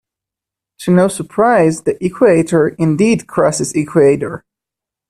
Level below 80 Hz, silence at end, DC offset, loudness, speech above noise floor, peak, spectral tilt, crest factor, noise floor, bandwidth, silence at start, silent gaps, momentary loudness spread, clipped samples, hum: -50 dBFS; 0.75 s; under 0.1%; -13 LUFS; 72 dB; 0 dBFS; -6 dB/octave; 14 dB; -85 dBFS; 14 kHz; 0.8 s; none; 8 LU; under 0.1%; none